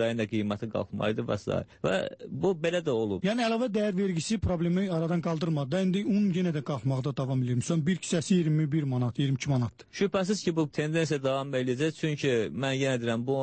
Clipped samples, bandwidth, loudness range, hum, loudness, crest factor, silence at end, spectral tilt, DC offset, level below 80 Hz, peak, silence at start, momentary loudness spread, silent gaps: under 0.1%; 8.8 kHz; 1 LU; none; -29 LUFS; 14 dB; 0 s; -6 dB/octave; under 0.1%; -56 dBFS; -14 dBFS; 0 s; 4 LU; none